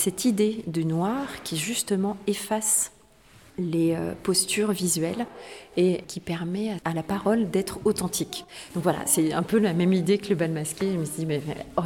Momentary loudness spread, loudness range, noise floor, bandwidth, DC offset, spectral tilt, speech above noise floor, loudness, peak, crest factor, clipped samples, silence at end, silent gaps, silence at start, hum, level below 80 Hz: 9 LU; 2 LU; -54 dBFS; 19 kHz; under 0.1%; -4.5 dB/octave; 29 dB; -26 LUFS; -6 dBFS; 18 dB; under 0.1%; 0 s; none; 0 s; none; -56 dBFS